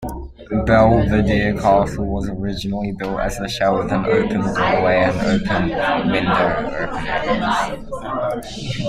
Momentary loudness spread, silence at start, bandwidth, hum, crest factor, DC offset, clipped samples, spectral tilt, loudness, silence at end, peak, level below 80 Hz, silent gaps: 9 LU; 0 s; 14.5 kHz; none; 16 dB; under 0.1%; under 0.1%; -6.5 dB/octave; -19 LUFS; 0 s; -2 dBFS; -32 dBFS; none